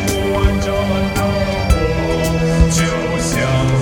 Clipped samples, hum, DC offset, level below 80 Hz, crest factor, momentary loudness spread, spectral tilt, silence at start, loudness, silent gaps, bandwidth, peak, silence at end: under 0.1%; none; under 0.1%; -22 dBFS; 16 dB; 3 LU; -5.5 dB/octave; 0 s; -16 LUFS; none; 18 kHz; 0 dBFS; 0 s